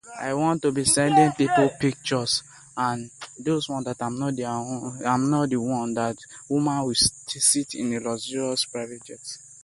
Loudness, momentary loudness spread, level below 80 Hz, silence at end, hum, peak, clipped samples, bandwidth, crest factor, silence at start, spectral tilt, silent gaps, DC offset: -24 LUFS; 13 LU; -56 dBFS; 0.05 s; none; -6 dBFS; under 0.1%; 12 kHz; 20 dB; 0.05 s; -3.5 dB/octave; none; under 0.1%